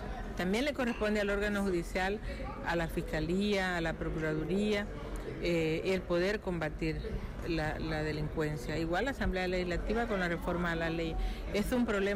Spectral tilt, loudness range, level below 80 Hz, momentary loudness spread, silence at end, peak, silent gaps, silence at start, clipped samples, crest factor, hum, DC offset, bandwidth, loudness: -6 dB/octave; 2 LU; -42 dBFS; 6 LU; 0 s; -24 dBFS; none; 0 s; under 0.1%; 10 dB; none; under 0.1%; 15.5 kHz; -34 LUFS